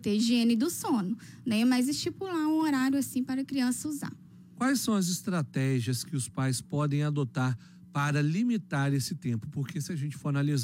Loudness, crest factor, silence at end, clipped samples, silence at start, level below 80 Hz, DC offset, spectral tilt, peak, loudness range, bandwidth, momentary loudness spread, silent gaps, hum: -30 LUFS; 12 dB; 0 s; under 0.1%; 0 s; -70 dBFS; under 0.1%; -5.5 dB/octave; -16 dBFS; 2 LU; 16 kHz; 8 LU; none; none